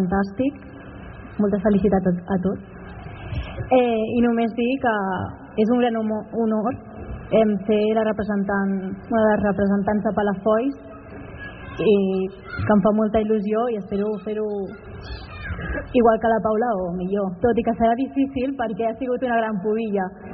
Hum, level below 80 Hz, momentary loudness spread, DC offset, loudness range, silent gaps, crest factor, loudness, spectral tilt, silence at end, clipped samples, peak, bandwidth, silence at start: none; -44 dBFS; 17 LU; under 0.1%; 2 LU; none; 16 dB; -22 LUFS; -6.5 dB/octave; 0 s; under 0.1%; -6 dBFS; 5 kHz; 0 s